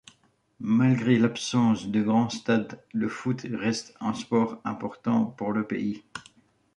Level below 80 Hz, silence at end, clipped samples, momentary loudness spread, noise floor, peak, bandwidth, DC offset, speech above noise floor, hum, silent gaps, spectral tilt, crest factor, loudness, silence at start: -66 dBFS; 0.55 s; under 0.1%; 11 LU; -65 dBFS; -8 dBFS; 10.5 kHz; under 0.1%; 39 dB; none; none; -6 dB/octave; 18 dB; -26 LUFS; 0.6 s